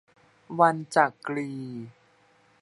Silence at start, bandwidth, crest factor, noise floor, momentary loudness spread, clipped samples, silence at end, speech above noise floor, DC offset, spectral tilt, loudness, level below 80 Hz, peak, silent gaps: 0.5 s; 11.5 kHz; 22 dB; -62 dBFS; 17 LU; under 0.1%; 0.7 s; 36 dB; under 0.1%; -6 dB/octave; -25 LUFS; -78 dBFS; -6 dBFS; none